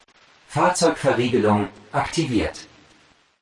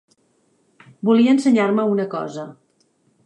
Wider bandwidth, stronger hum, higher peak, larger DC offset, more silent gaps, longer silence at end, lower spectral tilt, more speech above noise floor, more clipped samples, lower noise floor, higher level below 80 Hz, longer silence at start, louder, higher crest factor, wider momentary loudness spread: first, 11.5 kHz vs 9.8 kHz; neither; about the same, -6 dBFS vs -6 dBFS; neither; neither; about the same, 0.8 s vs 0.75 s; second, -5 dB/octave vs -6.5 dB/octave; second, 36 dB vs 46 dB; neither; second, -57 dBFS vs -63 dBFS; first, -50 dBFS vs -72 dBFS; second, 0.5 s vs 1.05 s; second, -21 LUFS vs -18 LUFS; about the same, 16 dB vs 14 dB; second, 10 LU vs 17 LU